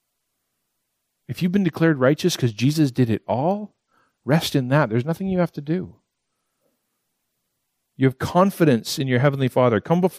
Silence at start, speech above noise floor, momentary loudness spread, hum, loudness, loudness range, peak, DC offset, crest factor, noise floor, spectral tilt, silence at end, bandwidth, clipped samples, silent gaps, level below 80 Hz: 1.3 s; 56 dB; 8 LU; none; -21 LUFS; 5 LU; -4 dBFS; under 0.1%; 18 dB; -76 dBFS; -6.5 dB/octave; 0 s; 15.5 kHz; under 0.1%; none; -58 dBFS